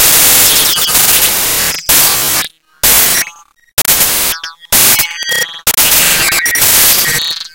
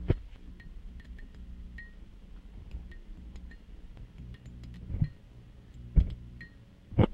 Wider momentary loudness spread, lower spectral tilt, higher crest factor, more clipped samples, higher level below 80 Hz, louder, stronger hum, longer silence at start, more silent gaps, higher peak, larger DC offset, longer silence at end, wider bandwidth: second, 9 LU vs 22 LU; second, 0.5 dB/octave vs -9.5 dB/octave; second, 10 dB vs 26 dB; first, 1% vs under 0.1%; about the same, -36 dBFS vs -38 dBFS; first, -7 LUFS vs -37 LUFS; neither; about the same, 0 s vs 0 s; first, 3.73-3.77 s vs none; first, 0 dBFS vs -10 dBFS; first, 0.3% vs under 0.1%; about the same, 0.05 s vs 0 s; first, over 20 kHz vs 5.4 kHz